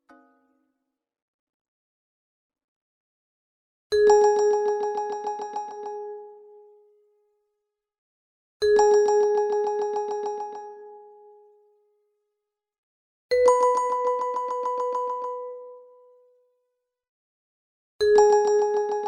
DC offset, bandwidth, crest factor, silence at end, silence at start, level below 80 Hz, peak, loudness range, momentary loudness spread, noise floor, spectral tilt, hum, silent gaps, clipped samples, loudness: under 0.1%; 9.6 kHz; 20 dB; 0 s; 3.9 s; -64 dBFS; -6 dBFS; 11 LU; 18 LU; -84 dBFS; -2.5 dB/octave; none; 7.98-8.60 s, 12.78-13.29 s, 17.09-17.99 s; under 0.1%; -23 LUFS